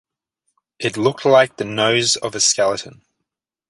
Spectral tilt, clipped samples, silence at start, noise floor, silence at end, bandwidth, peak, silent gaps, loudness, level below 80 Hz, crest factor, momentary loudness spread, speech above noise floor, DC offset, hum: -2.5 dB/octave; under 0.1%; 0.8 s; -80 dBFS; 0.8 s; 11.5 kHz; -2 dBFS; none; -17 LUFS; -62 dBFS; 18 dB; 10 LU; 63 dB; under 0.1%; none